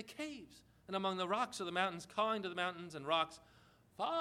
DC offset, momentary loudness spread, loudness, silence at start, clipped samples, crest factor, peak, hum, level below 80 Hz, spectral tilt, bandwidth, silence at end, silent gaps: under 0.1%; 10 LU; -39 LUFS; 0 s; under 0.1%; 20 dB; -20 dBFS; none; -76 dBFS; -4 dB/octave; 15.5 kHz; 0 s; none